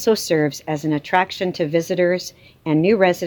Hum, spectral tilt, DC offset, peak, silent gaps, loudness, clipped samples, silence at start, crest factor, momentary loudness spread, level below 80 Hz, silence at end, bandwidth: none; -5.5 dB/octave; under 0.1%; -2 dBFS; none; -20 LUFS; under 0.1%; 0 s; 16 dB; 8 LU; -60 dBFS; 0 s; 19.5 kHz